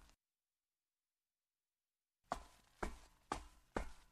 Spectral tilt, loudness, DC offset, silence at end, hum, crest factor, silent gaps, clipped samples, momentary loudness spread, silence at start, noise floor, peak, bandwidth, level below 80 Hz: -4.5 dB/octave; -50 LUFS; under 0.1%; 0.05 s; none; 30 dB; none; under 0.1%; 6 LU; 0 s; under -90 dBFS; -24 dBFS; 13.5 kHz; -60 dBFS